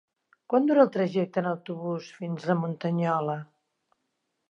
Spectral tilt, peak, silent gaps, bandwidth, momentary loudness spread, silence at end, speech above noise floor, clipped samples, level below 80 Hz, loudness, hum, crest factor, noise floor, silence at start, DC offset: -8.5 dB/octave; -6 dBFS; none; 7.4 kHz; 12 LU; 1.05 s; 53 dB; under 0.1%; -82 dBFS; -27 LUFS; none; 22 dB; -79 dBFS; 0.5 s; under 0.1%